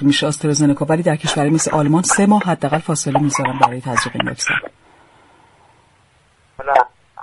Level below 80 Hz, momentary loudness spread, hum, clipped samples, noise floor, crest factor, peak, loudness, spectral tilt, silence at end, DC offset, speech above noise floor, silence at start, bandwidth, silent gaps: -52 dBFS; 6 LU; none; under 0.1%; -55 dBFS; 18 dB; 0 dBFS; -16 LUFS; -4.5 dB/octave; 0 s; under 0.1%; 39 dB; 0 s; 11.5 kHz; none